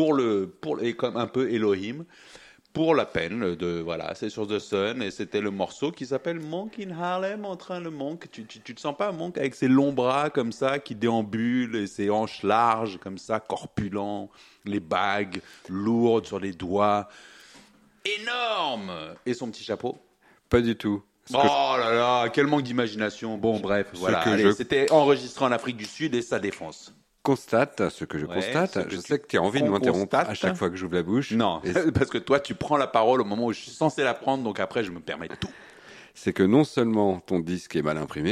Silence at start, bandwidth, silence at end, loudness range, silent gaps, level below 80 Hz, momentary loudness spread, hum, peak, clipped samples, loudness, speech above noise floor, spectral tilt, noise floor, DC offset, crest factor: 0 s; 13 kHz; 0 s; 6 LU; none; -58 dBFS; 12 LU; none; -6 dBFS; under 0.1%; -26 LUFS; 29 dB; -5.5 dB/octave; -55 dBFS; under 0.1%; 20 dB